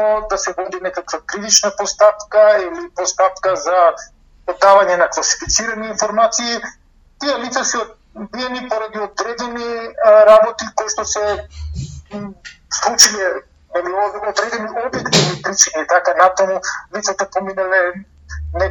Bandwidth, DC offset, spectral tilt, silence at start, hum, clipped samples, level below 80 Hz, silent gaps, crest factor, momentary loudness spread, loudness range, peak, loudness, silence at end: 15.5 kHz; under 0.1%; -2 dB/octave; 0 s; none; under 0.1%; -40 dBFS; none; 16 dB; 18 LU; 5 LU; 0 dBFS; -15 LUFS; 0 s